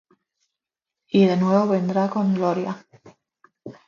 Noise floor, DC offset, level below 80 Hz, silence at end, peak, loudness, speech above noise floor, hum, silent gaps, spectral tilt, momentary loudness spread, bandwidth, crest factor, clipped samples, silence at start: -86 dBFS; under 0.1%; -68 dBFS; 0.15 s; -4 dBFS; -21 LUFS; 67 dB; none; none; -8 dB/octave; 10 LU; 7 kHz; 18 dB; under 0.1%; 1.15 s